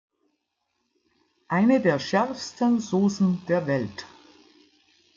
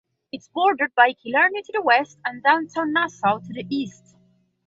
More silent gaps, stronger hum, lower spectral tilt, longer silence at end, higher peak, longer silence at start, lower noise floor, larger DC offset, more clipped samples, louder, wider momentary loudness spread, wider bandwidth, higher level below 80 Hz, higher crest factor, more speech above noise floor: neither; neither; first, -6.5 dB/octave vs -4.5 dB/octave; first, 1.1 s vs 0.75 s; second, -8 dBFS vs -4 dBFS; first, 1.5 s vs 0.35 s; first, -77 dBFS vs -61 dBFS; neither; neither; second, -24 LUFS vs -21 LUFS; second, 8 LU vs 12 LU; about the same, 7.6 kHz vs 7.8 kHz; about the same, -70 dBFS vs -70 dBFS; about the same, 18 dB vs 18 dB; first, 54 dB vs 39 dB